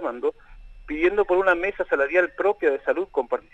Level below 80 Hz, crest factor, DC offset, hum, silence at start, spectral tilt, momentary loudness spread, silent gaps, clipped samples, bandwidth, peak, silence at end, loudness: -48 dBFS; 16 dB; under 0.1%; none; 0 s; -6 dB/octave; 8 LU; none; under 0.1%; 8 kHz; -6 dBFS; 0.15 s; -23 LUFS